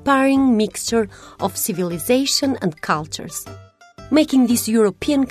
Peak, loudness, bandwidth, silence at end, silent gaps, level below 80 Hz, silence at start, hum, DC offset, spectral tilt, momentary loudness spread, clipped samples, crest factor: -2 dBFS; -19 LUFS; 14 kHz; 0 s; none; -50 dBFS; 0 s; none; under 0.1%; -4 dB/octave; 12 LU; under 0.1%; 16 dB